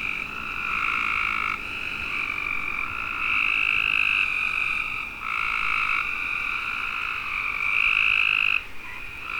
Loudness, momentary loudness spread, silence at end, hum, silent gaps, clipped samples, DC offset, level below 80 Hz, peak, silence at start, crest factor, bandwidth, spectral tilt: -23 LUFS; 9 LU; 0 s; none; none; under 0.1%; under 0.1%; -48 dBFS; -8 dBFS; 0 s; 18 dB; 19.5 kHz; -2 dB/octave